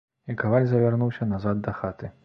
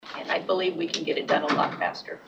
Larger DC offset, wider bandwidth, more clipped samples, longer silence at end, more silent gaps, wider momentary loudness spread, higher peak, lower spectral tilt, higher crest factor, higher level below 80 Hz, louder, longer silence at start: neither; second, 5.6 kHz vs 9 kHz; neither; first, 0.15 s vs 0 s; neither; first, 11 LU vs 6 LU; about the same, -8 dBFS vs -10 dBFS; first, -11 dB/octave vs -4 dB/octave; about the same, 18 dB vs 18 dB; first, -52 dBFS vs -76 dBFS; about the same, -25 LUFS vs -26 LUFS; first, 0.25 s vs 0.05 s